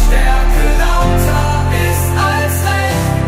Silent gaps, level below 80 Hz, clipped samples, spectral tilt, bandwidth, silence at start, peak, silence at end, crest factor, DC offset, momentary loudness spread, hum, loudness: none; -14 dBFS; under 0.1%; -5 dB/octave; 16 kHz; 0 s; 0 dBFS; 0 s; 10 dB; under 0.1%; 1 LU; none; -14 LUFS